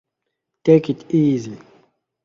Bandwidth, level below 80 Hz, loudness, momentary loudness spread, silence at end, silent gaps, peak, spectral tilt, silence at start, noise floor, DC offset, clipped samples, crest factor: 7.4 kHz; -62 dBFS; -18 LUFS; 9 LU; 0.7 s; none; 0 dBFS; -8.5 dB/octave; 0.65 s; -79 dBFS; under 0.1%; under 0.1%; 20 dB